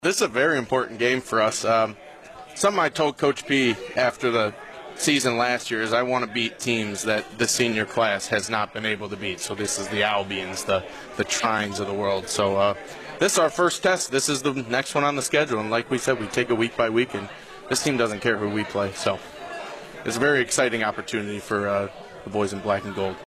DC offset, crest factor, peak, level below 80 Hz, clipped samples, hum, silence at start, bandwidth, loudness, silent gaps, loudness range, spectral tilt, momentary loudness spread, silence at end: under 0.1%; 16 dB; -8 dBFS; -58 dBFS; under 0.1%; none; 0 s; 15 kHz; -24 LUFS; none; 3 LU; -3 dB/octave; 9 LU; 0 s